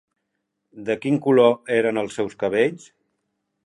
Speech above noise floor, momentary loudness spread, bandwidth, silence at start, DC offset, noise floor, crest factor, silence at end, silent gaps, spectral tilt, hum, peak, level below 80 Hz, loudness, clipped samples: 57 dB; 11 LU; 11 kHz; 0.75 s; under 0.1%; -77 dBFS; 18 dB; 0.9 s; none; -6 dB/octave; none; -4 dBFS; -66 dBFS; -21 LUFS; under 0.1%